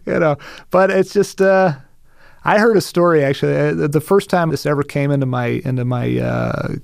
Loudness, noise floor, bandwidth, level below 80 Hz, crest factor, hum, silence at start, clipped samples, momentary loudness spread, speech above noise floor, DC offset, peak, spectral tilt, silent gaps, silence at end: -16 LUFS; -44 dBFS; 15.5 kHz; -46 dBFS; 14 dB; none; 0.05 s; under 0.1%; 7 LU; 28 dB; under 0.1%; -2 dBFS; -6.5 dB/octave; none; 0 s